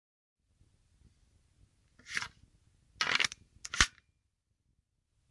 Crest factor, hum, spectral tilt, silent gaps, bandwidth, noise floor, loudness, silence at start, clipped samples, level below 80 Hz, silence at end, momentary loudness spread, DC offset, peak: 34 dB; none; -0.5 dB/octave; none; 11.5 kHz; -80 dBFS; -32 LUFS; 2.05 s; under 0.1%; -56 dBFS; 1.4 s; 14 LU; under 0.1%; -6 dBFS